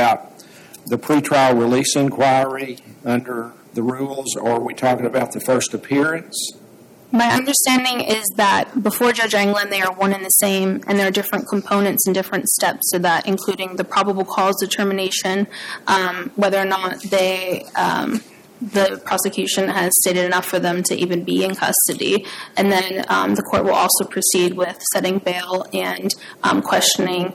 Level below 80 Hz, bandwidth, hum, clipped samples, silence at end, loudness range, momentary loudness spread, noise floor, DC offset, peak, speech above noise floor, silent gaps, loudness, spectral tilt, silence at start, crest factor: -60 dBFS; 17 kHz; none; under 0.1%; 0 s; 4 LU; 8 LU; -45 dBFS; under 0.1%; -4 dBFS; 26 dB; none; -18 LUFS; -3 dB/octave; 0 s; 16 dB